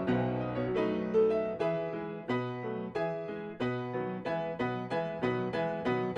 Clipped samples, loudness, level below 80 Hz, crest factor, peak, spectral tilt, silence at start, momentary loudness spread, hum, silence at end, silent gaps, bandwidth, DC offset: under 0.1%; -33 LUFS; -62 dBFS; 14 dB; -18 dBFS; -8 dB/octave; 0 s; 7 LU; none; 0 s; none; 8.6 kHz; under 0.1%